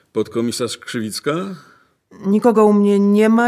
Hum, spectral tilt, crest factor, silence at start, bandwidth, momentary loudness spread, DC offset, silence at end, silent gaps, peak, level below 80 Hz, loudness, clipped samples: none; -6 dB/octave; 14 dB; 0.15 s; 14.5 kHz; 13 LU; under 0.1%; 0 s; none; -2 dBFS; -62 dBFS; -17 LUFS; under 0.1%